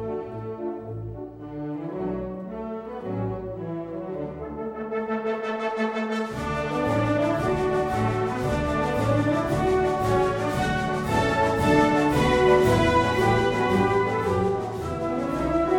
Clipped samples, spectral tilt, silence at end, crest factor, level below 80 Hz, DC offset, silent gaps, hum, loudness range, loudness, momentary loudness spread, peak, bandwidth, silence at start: under 0.1%; -6.5 dB/octave; 0 s; 16 dB; -42 dBFS; under 0.1%; none; none; 11 LU; -25 LUFS; 13 LU; -8 dBFS; 16.5 kHz; 0 s